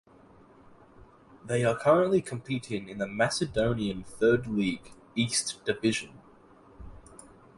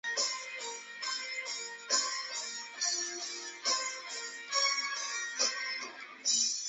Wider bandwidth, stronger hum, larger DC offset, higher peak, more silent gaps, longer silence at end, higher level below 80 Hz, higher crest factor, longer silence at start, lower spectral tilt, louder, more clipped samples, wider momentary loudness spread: first, 11.5 kHz vs 8.4 kHz; neither; neither; first, -10 dBFS vs -16 dBFS; neither; first, 0.4 s vs 0 s; first, -54 dBFS vs under -90 dBFS; about the same, 20 dB vs 20 dB; first, 1.45 s vs 0.05 s; first, -4.5 dB/octave vs 3 dB/octave; first, -28 LUFS vs -33 LUFS; neither; first, 13 LU vs 10 LU